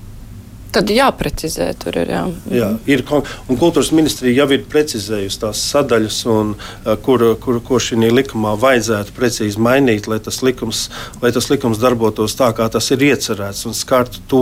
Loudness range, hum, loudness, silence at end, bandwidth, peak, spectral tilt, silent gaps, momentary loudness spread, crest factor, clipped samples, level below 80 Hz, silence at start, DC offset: 1 LU; none; -16 LUFS; 0 s; 16.5 kHz; -2 dBFS; -4.5 dB/octave; none; 7 LU; 14 dB; under 0.1%; -36 dBFS; 0 s; under 0.1%